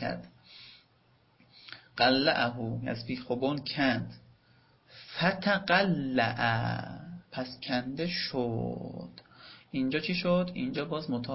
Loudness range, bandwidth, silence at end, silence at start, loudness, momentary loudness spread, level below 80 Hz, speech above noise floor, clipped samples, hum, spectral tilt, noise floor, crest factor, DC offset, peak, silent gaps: 4 LU; 5.8 kHz; 0 s; 0 s; -30 LUFS; 22 LU; -62 dBFS; 36 dB; under 0.1%; none; -9 dB/octave; -66 dBFS; 22 dB; under 0.1%; -10 dBFS; none